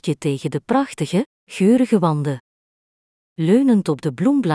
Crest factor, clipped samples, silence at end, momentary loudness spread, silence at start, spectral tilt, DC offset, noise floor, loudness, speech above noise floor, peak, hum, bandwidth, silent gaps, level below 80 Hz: 16 dB; under 0.1%; 0 s; 9 LU; 0.05 s; -7 dB/octave; under 0.1%; under -90 dBFS; -19 LUFS; over 72 dB; -4 dBFS; none; 11 kHz; 1.26-1.47 s, 2.40-3.36 s; -62 dBFS